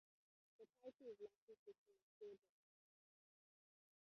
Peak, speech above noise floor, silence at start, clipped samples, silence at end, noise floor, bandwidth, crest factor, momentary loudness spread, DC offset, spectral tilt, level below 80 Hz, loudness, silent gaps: -46 dBFS; over 27 dB; 0.6 s; under 0.1%; 1.75 s; under -90 dBFS; 6.2 kHz; 20 dB; 9 LU; under 0.1%; -5 dB/octave; under -90 dBFS; -63 LUFS; 0.95-0.99 s, 1.38-1.48 s, 1.59-1.66 s, 1.78-1.86 s, 2.02-2.21 s